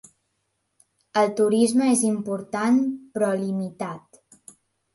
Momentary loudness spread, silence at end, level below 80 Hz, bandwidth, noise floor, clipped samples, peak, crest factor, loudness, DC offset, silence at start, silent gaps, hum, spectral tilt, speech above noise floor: 12 LU; 0.95 s; -72 dBFS; 11.5 kHz; -75 dBFS; under 0.1%; -8 dBFS; 16 dB; -23 LUFS; under 0.1%; 1.15 s; none; none; -5 dB/octave; 53 dB